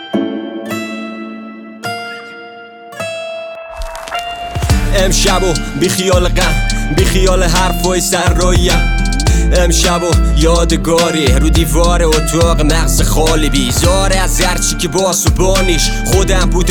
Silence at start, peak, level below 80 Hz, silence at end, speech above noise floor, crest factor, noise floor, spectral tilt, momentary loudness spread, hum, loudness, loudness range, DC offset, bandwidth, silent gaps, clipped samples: 0 s; 0 dBFS; -16 dBFS; 0 s; 22 dB; 12 dB; -32 dBFS; -4 dB/octave; 14 LU; none; -13 LUFS; 12 LU; under 0.1%; 19.5 kHz; none; under 0.1%